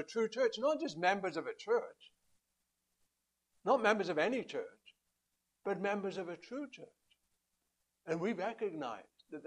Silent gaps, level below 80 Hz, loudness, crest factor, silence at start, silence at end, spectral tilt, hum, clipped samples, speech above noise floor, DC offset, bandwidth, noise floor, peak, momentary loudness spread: none; -86 dBFS; -37 LUFS; 24 dB; 0 s; 0 s; -5 dB/octave; none; under 0.1%; 49 dB; under 0.1%; 11 kHz; -85 dBFS; -14 dBFS; 17 LU